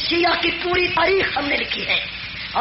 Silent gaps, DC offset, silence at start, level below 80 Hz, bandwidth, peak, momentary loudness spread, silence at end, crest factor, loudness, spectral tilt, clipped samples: none; under 0.1%; 0 s; -44 dBFS; 6 kHz; -8 dBFS; 7 LU; 0 s; 12 dB; -19 LUFS; -0.5 dB/octave; under 0.1%